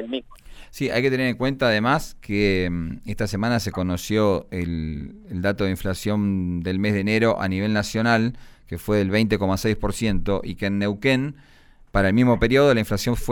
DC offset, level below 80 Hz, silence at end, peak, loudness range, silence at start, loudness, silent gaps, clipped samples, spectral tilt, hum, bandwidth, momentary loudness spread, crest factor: under 0.1%; -38 dBFS; 0 s; -6 dBFS; 3 LU; 0 s; -22 LUFS; none; under 0.1%; -6 dB/octave; none; 19.5 kHz; 10 LU; 16 dB